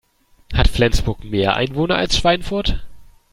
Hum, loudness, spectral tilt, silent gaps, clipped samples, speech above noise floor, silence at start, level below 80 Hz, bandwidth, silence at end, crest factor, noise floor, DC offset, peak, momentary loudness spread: none; -19 LUFS; -5 dB/octave; none; under 0.1%; 26 dB; 0.5 s; -24 dBFS; 15.5 kHz; 0.3 s; 18 dB; -44 dBFS; under 0.1%; 0 dBFS; 7 LU